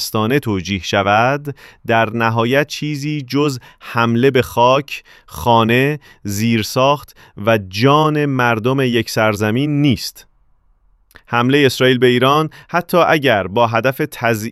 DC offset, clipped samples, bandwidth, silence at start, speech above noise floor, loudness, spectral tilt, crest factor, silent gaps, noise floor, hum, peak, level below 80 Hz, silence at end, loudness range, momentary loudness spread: under 0.1%; under 0.1%; 15.5 kHz; 0 s; 39 dB; -15 LUFS; -5.5 dB/octave; 16 dB; none; -54 dBFS; none; 0 dBFS; -48 dBFS; 0 s; 3 LU; 9 LU